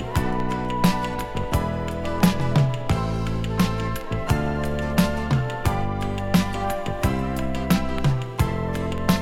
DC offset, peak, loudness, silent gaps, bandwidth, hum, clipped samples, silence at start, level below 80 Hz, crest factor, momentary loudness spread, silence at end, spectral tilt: under 0.1%; -4 dBFS; -24 LUFS; none; 17 kHz; none; under 0.1%; 0 s; -32 dBFS; 18 dB; 6 LU; 0 s; -6.5 dB/octave